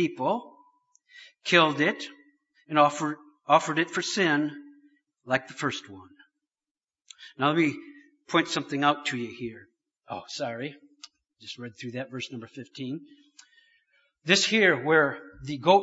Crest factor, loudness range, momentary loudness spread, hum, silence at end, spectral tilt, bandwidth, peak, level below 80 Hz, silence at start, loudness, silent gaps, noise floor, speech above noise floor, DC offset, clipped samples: 24 dB; 13 LU; 19 LU; none; 0 s; -4 dB/octave; 8 kHz; -4 dBFS; -70 dBFS; 0 s; -26 LUFS; 6.71-6.75 s; under -90 dBFS; over 64 dB; under 0.1%; under 0.1%